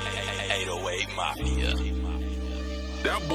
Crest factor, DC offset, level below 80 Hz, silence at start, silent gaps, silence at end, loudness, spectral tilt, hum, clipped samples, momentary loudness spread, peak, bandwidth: 18 dB; under 0.1%; -32 dBFS; 0 s; none; 0 s; -30 LUFS; -4 dB/octave; none; under 0.1%; 6 LU; -10 dBFS; 14 kHz